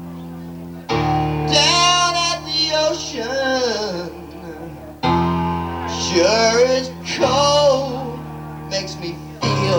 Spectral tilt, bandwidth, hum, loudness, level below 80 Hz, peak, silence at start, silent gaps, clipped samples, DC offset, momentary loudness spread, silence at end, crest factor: -3.5 dB/octave; over 20 kHz; none; -17 LUFS; -42 dBFS; -2 dBFS; 0 s; none; under 0.1%; under 0.1%; 19 LU; 0 s; 16 dB